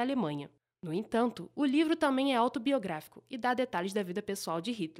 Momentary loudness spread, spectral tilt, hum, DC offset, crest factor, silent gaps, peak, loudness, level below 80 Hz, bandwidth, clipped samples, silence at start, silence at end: 12 LU; -5 dB/octave; none; under 0.1%; 16 dB; none; -16 dBFS; -32 LUFS; -74 dBFS; 15.5 kHz; under 0.1%; 0 s; 0.05 s